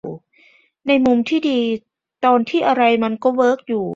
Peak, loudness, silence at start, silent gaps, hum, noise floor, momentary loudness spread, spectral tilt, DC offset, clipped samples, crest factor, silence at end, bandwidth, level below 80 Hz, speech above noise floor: -2 dBFS; -17 LUFS; 0.05 s; none; none; -54 dBFS; 12 LU; -6 dB/octave; under 0.1%; under 0.1%; 16 dB; 0 s; 7.6 kHz; -60 dBFS; 38 dB